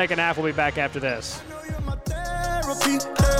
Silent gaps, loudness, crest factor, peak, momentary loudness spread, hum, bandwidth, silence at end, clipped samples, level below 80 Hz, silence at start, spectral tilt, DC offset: none; -25 LUFS; 16 dB; -8 dBFS; 10 LU; none; 16.5 kHz; 0 s; under 0.1%; -32 dBFS; 0 s; -4.5 dB/octave; under 0.1%